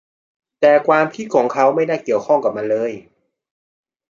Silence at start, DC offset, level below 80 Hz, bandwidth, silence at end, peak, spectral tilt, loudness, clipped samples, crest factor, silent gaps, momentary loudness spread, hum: 0.6 s; under 0.1%; -68 dBFS; 7.4 kHz; 1.1 s; -2 dBFS; -6 dB/octave; -17 LUFS; under 0.1%; 16 dB; none; 7 LU; none